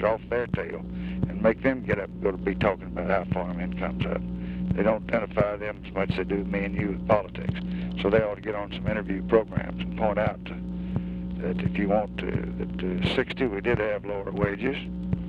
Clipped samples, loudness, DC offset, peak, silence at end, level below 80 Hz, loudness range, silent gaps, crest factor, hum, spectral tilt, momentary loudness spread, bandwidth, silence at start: under 0.1%; -28 LUFS; under 0.1%; -6 dBFS; 0 s; -42 dBFS; 2 LU; none; 20 dB; none; -9 dB/octave; 8 LU; 5.2 kHz; 0 s